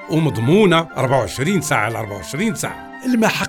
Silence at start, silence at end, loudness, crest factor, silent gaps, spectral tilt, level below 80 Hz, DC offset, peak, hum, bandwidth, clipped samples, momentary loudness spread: 0 s; 0 s; -18 LUFS; 14 dB; none; -5.5 dB/octave; -48 dBFS; under 0.1%; -4 dBFS; none; 18.5 kHz; under 0.1%; 12 LU